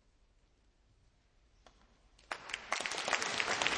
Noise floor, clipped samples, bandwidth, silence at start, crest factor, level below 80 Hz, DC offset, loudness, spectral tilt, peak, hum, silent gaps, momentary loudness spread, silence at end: -70 dBFS; under 0.1%; 10.5 kHz; 2.3 s; 30 dB; -68 dBFS; under 0.1%; -36 LUFS; -0.5 dB/octave; -12 dBFS; none; none; 12 LU; 0 s